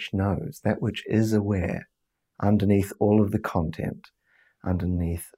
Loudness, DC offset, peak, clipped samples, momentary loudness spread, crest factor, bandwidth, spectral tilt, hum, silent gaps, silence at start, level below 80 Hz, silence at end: -26 LUFS; under 0.1%; -10 dBFS; under 0.1%; 11 LU; 16 dB; 16 kHz; -7.5 dB/octave; none; none; 0 s; -50 dBFS; 0.1 s